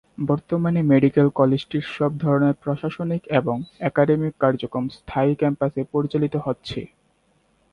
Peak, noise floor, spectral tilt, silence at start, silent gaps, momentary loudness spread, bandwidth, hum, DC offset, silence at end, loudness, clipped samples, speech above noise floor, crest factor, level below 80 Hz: -4 dBFS; -64 dBFS; -9 dB/octave; 0.2 s; none; 10 LU; 6.6 kHz; none; under 0.1%; 0.85 s; -22 LUFS; under 0.1%; 43 dB; 18 dB; -54 dBFS